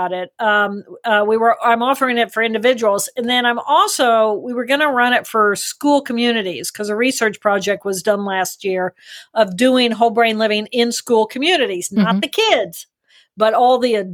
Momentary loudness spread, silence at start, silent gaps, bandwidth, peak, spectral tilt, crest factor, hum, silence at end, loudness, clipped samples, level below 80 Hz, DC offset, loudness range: 7 LU; 0 s; none; over 20 kHz; -2 dBFS; -3.5 dB/octave; 16 dB; none; 0 s; -16 LUFS; under 0.1%; -66 dBFS; under 0.1%; 3 LU